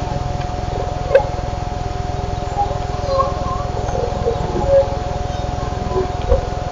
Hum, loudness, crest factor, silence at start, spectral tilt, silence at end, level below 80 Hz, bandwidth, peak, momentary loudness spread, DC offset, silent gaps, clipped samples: none; -20 LUFS; 18 dB; 0 s; -6.5 dB/octave; 0 s; -26 dBFS; 7.6 kHz; -2 dBFS; 8 LU; under 0.1%; none; under 0.1%